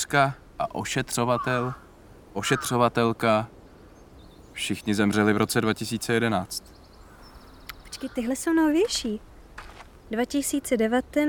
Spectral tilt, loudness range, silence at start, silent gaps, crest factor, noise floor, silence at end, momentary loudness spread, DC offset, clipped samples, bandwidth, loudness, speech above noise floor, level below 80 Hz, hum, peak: -4.5 dB/octave; 3 LU; 0 s; none; 20 dB; -49 dBFS; 0 s; 19 LU; under 0.1%; under 0.1%; 19.5 kHz; -25 LUFS; 25 dB; -52 dBFS; none; -6 dBFS